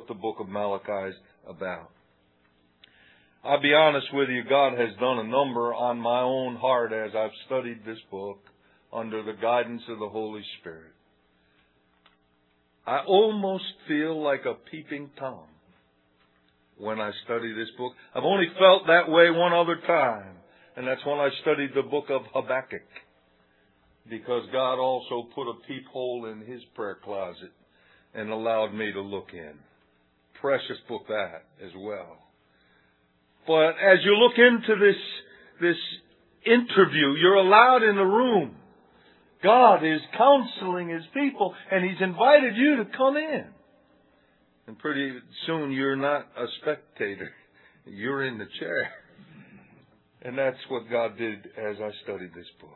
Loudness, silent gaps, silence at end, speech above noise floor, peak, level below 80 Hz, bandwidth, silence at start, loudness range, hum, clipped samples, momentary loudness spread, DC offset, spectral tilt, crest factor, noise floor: -24 LUFS; none; 0.25 s; 43 dB; -4 dBFS; -76 dBFS; 4.3 kHz; 0 s; 13 LU; none; under 0.1%; 20 LU; under 0.1%; -8 dB/octave; 22 dB; -67 dBFS